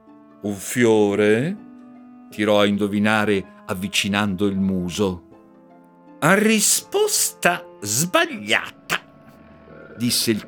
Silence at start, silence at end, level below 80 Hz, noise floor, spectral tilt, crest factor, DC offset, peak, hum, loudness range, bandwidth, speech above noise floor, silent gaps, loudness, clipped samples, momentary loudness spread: 0.45 s; 0 s; -60 dBFS; -49 dBFS; -3.5 dB/octave; 20 dB; under 0.1%; -2 dBFS; none; 3 LU; over 20 kHz; 29 dB; none; -20 LUFS; under 0.1%; 11 LU